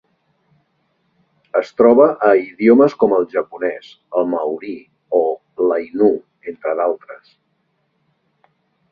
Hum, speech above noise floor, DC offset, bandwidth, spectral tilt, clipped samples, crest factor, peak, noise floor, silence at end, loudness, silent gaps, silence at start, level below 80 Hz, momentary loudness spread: none; 51 dB; under 0.1%; 6.8 kHz; -8 dB/octave; under 0.1%; 18 dB; 0 dBFS; -67 dBFS; 1.75 s; -16 LUFS; none; 1.55 s; -62 dBFS; 15 LU